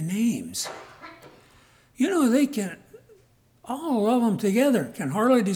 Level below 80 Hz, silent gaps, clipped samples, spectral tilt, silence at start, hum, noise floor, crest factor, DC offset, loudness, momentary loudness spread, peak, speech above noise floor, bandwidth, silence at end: -68 dBFS; none; under 0.1%; -5.5 dB/octave; 0 s; none; -60 dBFS; 16 dB; under 0.1%; -24 LUFS; 21 LU; -10 dBFS; 37 dB; 19.5 kHz; 0 s